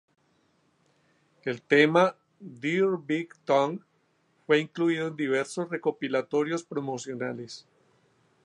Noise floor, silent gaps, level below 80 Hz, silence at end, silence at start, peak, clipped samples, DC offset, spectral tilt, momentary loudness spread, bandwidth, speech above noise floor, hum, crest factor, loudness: -69 dBFS; none; -82 dBFS; 0.85 s; 1.45 s; -6 dBFS; under 0.1%; under 0.1%; -5.5 dB/octave; 15 LU; 11.5 kHz; 42 dB; none; 22 dB; -27 LUFS